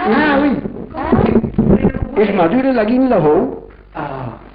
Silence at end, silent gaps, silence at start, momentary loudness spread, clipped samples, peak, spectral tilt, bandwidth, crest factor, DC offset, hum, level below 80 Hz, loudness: 0.05 s; none; 0 s; 14 LU; under 0.1%; -2 dBFS; -12.5 dB/octave; 5.2 kHz; 12 dB; under 0.1%; none; -32 dBFS; -14 LUFS